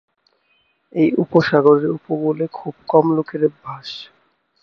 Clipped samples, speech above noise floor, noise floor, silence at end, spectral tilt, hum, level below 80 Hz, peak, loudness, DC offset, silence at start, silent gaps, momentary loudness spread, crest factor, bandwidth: under 0.1%; 46 dB; -63 dBFS; 0.6 s; -8 dB/octave; none; -62 dBFS; 0 dBFS; -17 LUFS; under 0.1%; 0.95 s; none; 17 LU; 18 dB; 6.6 kHz